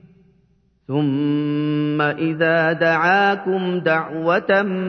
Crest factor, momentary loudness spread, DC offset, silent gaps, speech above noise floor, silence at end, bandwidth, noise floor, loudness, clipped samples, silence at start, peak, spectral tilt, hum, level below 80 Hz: 16 dB; 5 LU; under 0.1%; none; 42 dB; 0 s; 6.4 kHz; -60 dBFS; -19 LUFS; under 0.1%; 0.9 s; -4 dBFS; -8 dB/octave; none; -64 dBFS